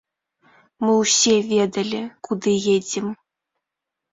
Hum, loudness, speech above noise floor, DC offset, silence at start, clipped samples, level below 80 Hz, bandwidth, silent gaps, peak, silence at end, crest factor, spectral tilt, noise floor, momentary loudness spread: none; -20 LUFS; 64 dB; under 0.1%; 0.8 s; under 0.1%; -64 dBFS; 7.8 kHz; none; -6 dBFS; 1 s; 18 dB; -3 dB/octave; -84 dBFS; 13 LU